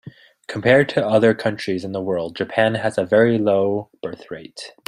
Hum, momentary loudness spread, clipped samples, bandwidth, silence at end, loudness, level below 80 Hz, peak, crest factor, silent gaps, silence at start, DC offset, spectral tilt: none; 17 LU; under 0.1%; 11 kHz; 0.15 s; -19 LUFS; -60 dBFS; -2 dBFS; 18 dB; none; 0.05 s; under 0.1%; -6.5 dB/octave